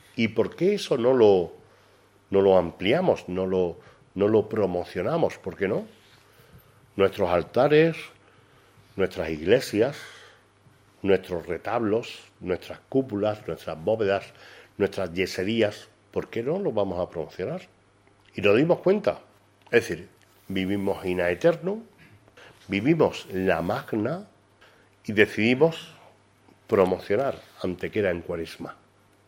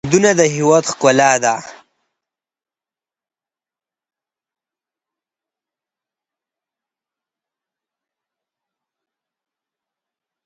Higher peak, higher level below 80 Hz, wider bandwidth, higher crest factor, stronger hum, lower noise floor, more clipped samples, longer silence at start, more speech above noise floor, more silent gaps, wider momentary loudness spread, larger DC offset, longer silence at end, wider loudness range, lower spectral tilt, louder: about the same, -2 dBFS vs 0 dBFS; about the same, -60 dBFS vs -62 dBFS; first, 16 kHz vs 9 kHz; about the same, 24 dB vs 22 dB; neither; second, -60 dBFS vs under -90 dBFS; neither; about the same, 0.15 s vs 0.05 s; second, 35 dB vs over 77 dB; neither; first, 16 LU vs 6 LU; neither; second, 0.55 s vs 8.75 s; second, 4 LU vs 10 LU; first, -6.5 dB/octave vs -4 dB/octave; second, -25 LUFS vs -13 LUFS